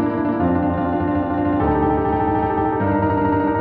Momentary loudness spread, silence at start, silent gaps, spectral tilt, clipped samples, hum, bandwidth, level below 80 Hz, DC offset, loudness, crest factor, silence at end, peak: 2 LU; 0 s; none; -12 dB/octave; under 0.1%; none; 4.5 kHz; -36 dBFS; under 0.1%; -19 LUFS; 12 dB; 0 s; -6 dBFS